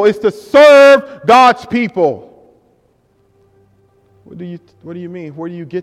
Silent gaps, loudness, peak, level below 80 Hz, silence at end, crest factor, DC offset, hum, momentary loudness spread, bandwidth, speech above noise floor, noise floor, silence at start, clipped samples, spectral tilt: none; -9 LUFS; 0 dBFS; -56 dBFS; 0 s; 12 dB; under 0.1%; none; 25 LU; 12.5 kHz; 45 dB; -56 dBFS; 0 s; 0.4%; -5 dB/octave